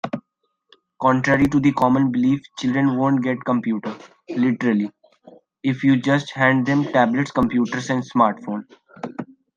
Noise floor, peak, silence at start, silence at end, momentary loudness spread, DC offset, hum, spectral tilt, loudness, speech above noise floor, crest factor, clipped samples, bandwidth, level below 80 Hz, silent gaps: -72 dBFS; -2 dBFS; 0.05 s; 0.35 s; 14 LU; under 0.1%; none; -7 dB/octave; -20 LUFS; 53 dB; 18 dB; under 0.1%; 7.6 kHz; -54 dBFS; none